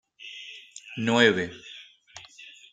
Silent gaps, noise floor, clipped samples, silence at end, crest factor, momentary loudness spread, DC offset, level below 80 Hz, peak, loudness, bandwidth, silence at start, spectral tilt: none; -50 dBFS; under 0.1%; 0.3 s; 24 dB; 26 LU; under 0.1%; -70 dBFS; -4 dBFS; -23 LUFS; 9.4 kHz; 0.25 s; -4 dB/octave